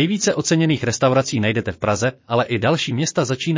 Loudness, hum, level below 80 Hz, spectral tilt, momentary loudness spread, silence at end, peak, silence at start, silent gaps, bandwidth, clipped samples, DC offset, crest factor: -19 LUFS; none; -48 dBFS; -5 dB/octave; 4 LU; 0 s; -4 dBFS; 0 s; none; 7.8 kHz; under 0.1%; under 0.1%; 14 dB